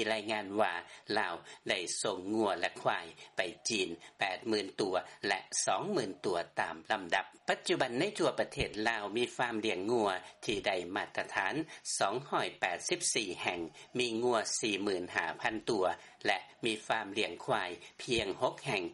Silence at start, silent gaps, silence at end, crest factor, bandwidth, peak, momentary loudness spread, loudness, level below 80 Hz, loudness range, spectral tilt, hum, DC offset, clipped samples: 0 s; none; 0 s; 20 dB; 11.5 kHz; -16 dBFS; 5 LU; -34 LUFS; -66 dBFS; 1 LU; -2.5 dB/octave; none; under 0.1%; under 0.1%